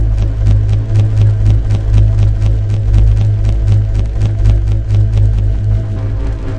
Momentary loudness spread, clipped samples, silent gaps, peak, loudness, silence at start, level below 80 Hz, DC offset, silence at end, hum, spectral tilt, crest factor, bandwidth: 5 LU; under 0.1%; none; 0 dBFS; -13 LUFS; 0 s; -14 dBFS; 0.4%; 0 s; none; -8.5 dB/octave; 10 dB; 6.4 kHz